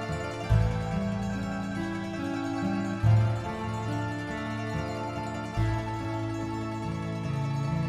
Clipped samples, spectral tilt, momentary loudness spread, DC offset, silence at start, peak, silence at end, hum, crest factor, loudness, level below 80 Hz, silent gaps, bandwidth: under 0.1%; -7 dB/octave; 7 LU; under 0.1%; 0 s; -12 dBFS; 0 s; none; 18 dB; -31 LUFS; -42 dBFS; none; 11 kHz